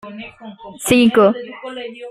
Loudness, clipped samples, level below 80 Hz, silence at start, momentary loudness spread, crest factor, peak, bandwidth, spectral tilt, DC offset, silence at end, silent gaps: -14 LUFS; under 0.1%; -52 dBFS; 0.05 s; 23 LU; 16 dB; -2 dBFS; 15 kHz; -4.5 dB/octave; under 0.1%; 0 s; none